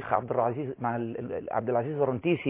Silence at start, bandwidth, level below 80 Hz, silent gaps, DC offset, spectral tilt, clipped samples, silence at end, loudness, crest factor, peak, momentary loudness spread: 0 s; 3.8 kHz; -62 dBFS; none; under 0.1%; -11 dB/octave; under 0.1%; 0 s; -30 LUFS; 18 dB; -10 dBFS; 6 LU